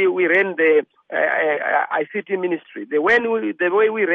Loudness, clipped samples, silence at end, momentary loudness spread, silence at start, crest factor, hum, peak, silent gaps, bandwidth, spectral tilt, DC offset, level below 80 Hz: -19 LUFS; under 0.1%; 0 s; 8 LU; 0 s; 14 dB; none; -6 dBFS; none; 6.6 kHz; -6.5 dB/octave; under 0.1%; -66 dBFS